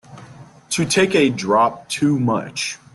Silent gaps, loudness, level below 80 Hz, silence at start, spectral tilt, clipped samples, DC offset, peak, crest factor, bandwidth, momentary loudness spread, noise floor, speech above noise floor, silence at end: none; -18 LUFS; -58 dBFS; 0.1 s; -4.5 dB/octave; under 0.1%; under 0.1%; -4 dBFS; 16 dB; 12.5 kHz; 9 LU; -42 dBFS; 24 dB; 0.2 s